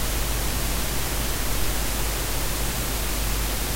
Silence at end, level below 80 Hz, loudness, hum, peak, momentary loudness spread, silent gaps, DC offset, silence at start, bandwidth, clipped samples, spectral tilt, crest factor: 0 s; -28 dBFS; -26 LUFS; none; -10 dBFS; 0 LU; none; under 0.1%; 0 s; 16 kHz; under 0.1%; -3 dB/octave; 14 dB